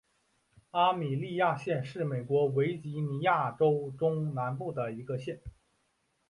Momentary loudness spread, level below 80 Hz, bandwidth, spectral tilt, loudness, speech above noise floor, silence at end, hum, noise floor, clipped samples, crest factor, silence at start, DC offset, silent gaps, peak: 9 LU; -64 dBFS; 11 kHz; -8 dB/octave; -31 LUFS; 45 dB; 0.8 s; none; -76 dBFS; under 0.1%; 18 dB; 0.75 s; under 0.1%; none; -14 dBFS